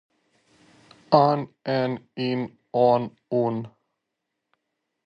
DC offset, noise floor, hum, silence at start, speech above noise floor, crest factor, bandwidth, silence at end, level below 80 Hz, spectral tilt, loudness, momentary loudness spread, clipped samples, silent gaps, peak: under 0.1%; -81 dBFS; none; 1.1 s; 59 dB; 22 dB; 6.8 kHz; 1.35 s; -70 dBFS; -8.5 dB/octave; -24 LUFS; 10 LU; under 0.1%; none; -2 dBFS